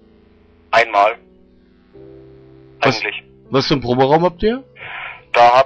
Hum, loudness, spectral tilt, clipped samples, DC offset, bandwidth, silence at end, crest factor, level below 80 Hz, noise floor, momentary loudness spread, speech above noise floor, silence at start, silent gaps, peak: none; -16 LUFS; -5.5 dB/octave; under 0.1%; under 0.1%; 8.4 kHz; 0 s; 14 dB; -44 dBFS; -50 dBFS; 16 LU; 36 dB; 0.7 s; none; -4 dBFS